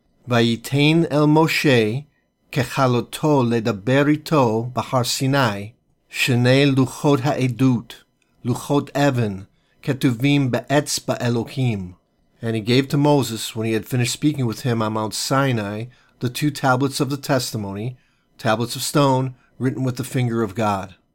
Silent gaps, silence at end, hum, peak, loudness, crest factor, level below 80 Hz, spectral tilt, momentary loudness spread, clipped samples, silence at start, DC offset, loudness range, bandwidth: none; 0.25 s; none; -4 dBFS; -20 LUFS; 16 dB; -56 dBFS; -5.5 dB/octave; 11 LU; under 0.1%; 0.25 s; under 0.1%; 4 LU; 17 kHz